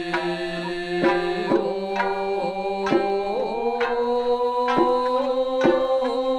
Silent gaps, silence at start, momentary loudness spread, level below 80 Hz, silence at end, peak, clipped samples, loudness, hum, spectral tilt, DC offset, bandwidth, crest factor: none; 0 s; 6 LU; -52 dBFS; 0 s; -4 dBFS; under 0.1%; -23 LUFS; none; -6 dB/octave; under 0.1%; 11 kHz; 18 dB